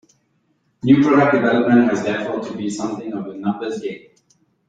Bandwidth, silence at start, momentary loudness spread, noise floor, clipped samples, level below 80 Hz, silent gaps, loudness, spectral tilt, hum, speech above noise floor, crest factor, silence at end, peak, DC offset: 9.2 kHz; 0.85 s; 14 LU; -65 dBFS; under 0.1%; -60 dBFS; none; -18 LUFS; -6.5 dB/octave; none; 47 dB; 18 dB; 0.7 s; -2 dBFS; under 0.1%